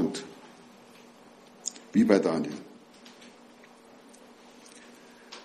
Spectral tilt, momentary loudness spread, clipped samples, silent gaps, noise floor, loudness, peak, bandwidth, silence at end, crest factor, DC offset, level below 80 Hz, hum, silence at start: -5 dB/octave; 29 LU; under 0.1%; none; -53 dBFS; -27 LUFS; -6 dBFS; 13 kHz; 0.05 s; 26 dB; under 0.1%; -72 dBFS; none; 0 s